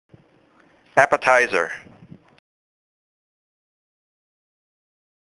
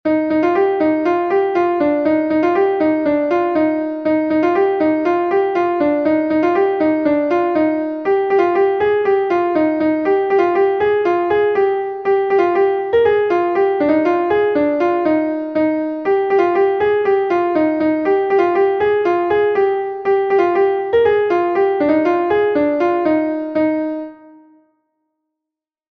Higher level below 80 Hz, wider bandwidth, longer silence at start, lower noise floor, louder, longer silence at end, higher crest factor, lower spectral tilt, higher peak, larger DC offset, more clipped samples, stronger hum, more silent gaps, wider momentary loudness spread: second, -66 dBFS vs -54 dBFS; first, 11.5 kHz vs 6.2 kHz; first, 0.95 s vs 0.05 s; second, -57 dBFS vs -85 dBFS; about the same, -18 LUFS vs -16 LUFS; first, 3.6 s vs 1.75 s; first, 26 dB vs 12 dB; second, -3 dB/octave vs -7.5 dB/octave; first, 0 dBFS vs -4 dBFS; neither; neither; neither; neither; first, 12 LU vs 3 LU